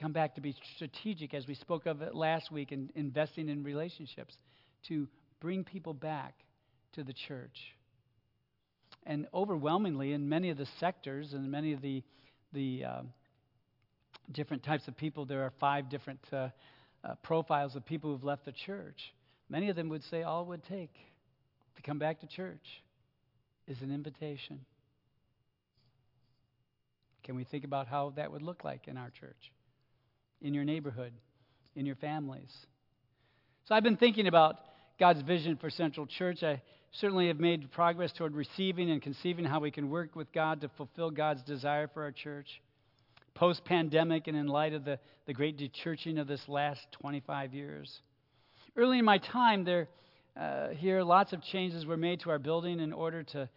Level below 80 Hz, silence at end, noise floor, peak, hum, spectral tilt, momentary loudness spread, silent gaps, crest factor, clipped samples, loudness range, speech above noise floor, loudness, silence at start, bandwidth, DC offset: -82 dBFS; 0.1 s; -80 dBFS; -10 dBFS; none; -8.5 dB/octave; 18 LU; none; 24 dB; under 0.1%; 13 LU; 45 dB; -34 LUFS; 0 s; 5.8 kHz; under 0.1%